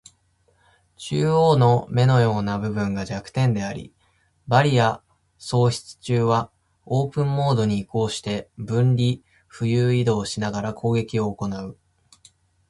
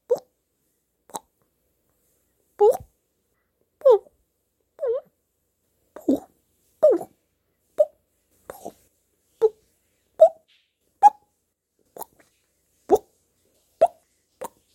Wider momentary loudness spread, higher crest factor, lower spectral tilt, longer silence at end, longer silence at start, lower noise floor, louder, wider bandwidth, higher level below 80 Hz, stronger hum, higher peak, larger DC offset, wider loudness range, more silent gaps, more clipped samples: second, 12 LU vs 23 LU; about the same, 20 dB vs 24 dB; about the same, -6.5 dB/octave vs -5.5 dB/octave; first, 0.95 s vs 0.3 s; first, 1 s vs 0.1 s; second, -64 dBFS vs -75 dBFS; about the same, -22 LUFS vs -22 LUFS; second, 11.5 kHz vs 16.5 kHz; first, -52 dBFS vs -66 dBFS; neither; about the same, -2 dBFS vs -2 dBFS; neither; about the same, 3 LU vs 5 LU; neither; neither